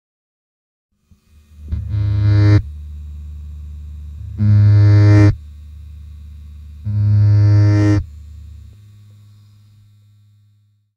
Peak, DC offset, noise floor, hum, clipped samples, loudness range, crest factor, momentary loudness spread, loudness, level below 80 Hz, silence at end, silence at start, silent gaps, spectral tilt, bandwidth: 0 dBFS; under 0.1%; -56 dBFS; none; under 0.1%; 5 LU; 16 dB; 27 LU; -13 LUFS; -34 dBFS; 2.55 s; 1.6 s; none; -9 dB/octave; 6.2 kHz